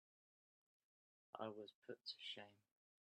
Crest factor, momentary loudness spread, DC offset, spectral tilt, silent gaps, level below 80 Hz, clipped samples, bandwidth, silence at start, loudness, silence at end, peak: 24 dB; 9 LU; under 0.1%; -4.5 dB/octave; 1.75-1.82 s; under -90 dBFS; under 0.1%; 11 kHz; 1.35 s; -54 LUFS; 0.55 s; -34 dBFS